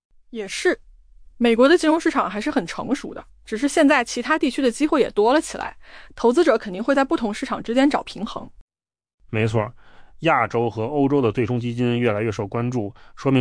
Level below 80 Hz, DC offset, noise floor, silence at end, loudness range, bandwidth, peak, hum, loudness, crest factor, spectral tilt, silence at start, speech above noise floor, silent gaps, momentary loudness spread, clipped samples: -50 dBFS; under 0.1%; -47 dBFS; 0 s; 4 LU; 10.5 kHz; -6 dBFS; none; -21 LUFS; 16 dB; -5.5 dB/octave; 0.3 s; 26 dB; 8.61-8.68 s, 9.14-9.18 s; 14 LU; under 0.1%